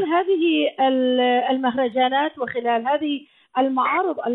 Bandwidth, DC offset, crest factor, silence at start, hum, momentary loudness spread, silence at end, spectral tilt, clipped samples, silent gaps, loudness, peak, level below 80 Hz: 4.1 kHz; under 0.1%; 12 dB; 0 s; none; 6 LU; 0 s; -7.5 dB/octave; under 0.1%; none; -21 LUFS; -8 dBFS; -68 dBFS